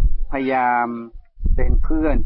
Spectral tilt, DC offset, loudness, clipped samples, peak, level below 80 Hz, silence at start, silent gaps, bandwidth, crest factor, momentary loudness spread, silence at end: -12.5 dB/octave; under 0.1%; -22 LUFS; under 0.1%; -6 dBFS; -20 dBFS; 0 s; none; 4.1 kHz; 10 dB; 12 LU; 0 s